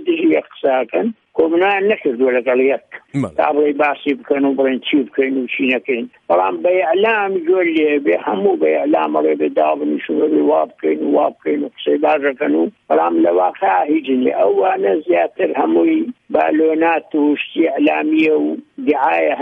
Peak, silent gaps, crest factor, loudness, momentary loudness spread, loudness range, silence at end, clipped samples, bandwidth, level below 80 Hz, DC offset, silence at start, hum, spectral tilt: -2 dBFS; none; 14 dB; -16 LUFS; 5 LU; 1 LU; 0 s; under 0.1%; 4.1 kHz; -66 dBFS; under 0.1%; 0 s; none; -7.5 dB/octave